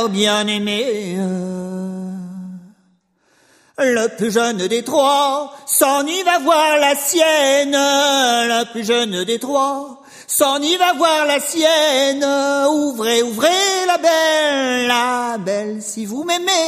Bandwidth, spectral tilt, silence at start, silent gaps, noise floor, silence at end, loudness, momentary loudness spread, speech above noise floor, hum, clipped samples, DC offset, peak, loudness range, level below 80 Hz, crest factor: 15.5 kHz; -2.5 dB/octave; 0 s; none; -60 dBFS; 0 s; -16 LUFS; 11 LU; 43 dB; none; under 0.1%; under 0.1%; 0 dBFS; 8 LU; -66 dBFS; 16 dB